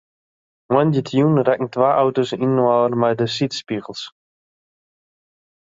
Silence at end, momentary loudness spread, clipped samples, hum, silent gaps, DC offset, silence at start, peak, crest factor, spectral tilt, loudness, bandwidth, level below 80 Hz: 1.5 s; 11 LU; under 0.1%; none; none; under 0.1%; 0.7 s; -2 dBFS; 18 dB; -7 dB/octave; -18 LUFS; 7.8 kHz; -62 dBFS